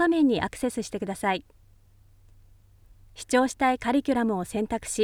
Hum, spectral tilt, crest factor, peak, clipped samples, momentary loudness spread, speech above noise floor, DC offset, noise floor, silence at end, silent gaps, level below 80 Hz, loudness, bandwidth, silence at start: none; -4.5 dB/octave; 18 dB; -8 dBFS; under 0.1%; 9 LU; 31 dB; under 0.1%; -56 dBFS; 0 s; none; -54 dBFS; -26 LUFS; 17.5 kHz; 0 s